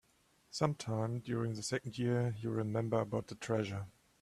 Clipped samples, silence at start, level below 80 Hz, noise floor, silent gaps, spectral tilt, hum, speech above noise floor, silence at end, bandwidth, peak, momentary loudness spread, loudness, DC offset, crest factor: under 0.1%; 0.5 s; -70 dBFS; -71 dBFS; none; -6 dB/octave; none; 35 dB; 0.3 s; 12.5 kHz; -16 dBFS; 6 LU; -37 LUFS; under 0.1%; 20 dB